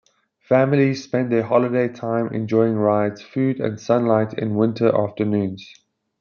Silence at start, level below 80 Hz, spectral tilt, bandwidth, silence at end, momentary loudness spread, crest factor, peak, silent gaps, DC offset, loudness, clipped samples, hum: 0.5 s; -66 dBFS; -8 dB/octave; 7 kHz; 0.55 s; 6 LU; 18 dB; -2 dBFS; none; under 0.1%; -20 LUFS; under 0.1%; none